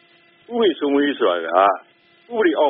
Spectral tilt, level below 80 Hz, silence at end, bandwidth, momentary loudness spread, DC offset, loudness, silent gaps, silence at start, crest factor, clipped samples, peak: -1 dB/octave; -68 dBFS; 0 s; 3.9 kHz; 12 LU; under 0.1%; -19 LUFS; none; 0.5 s; 18 dB; under 0.1%; -2 dBFS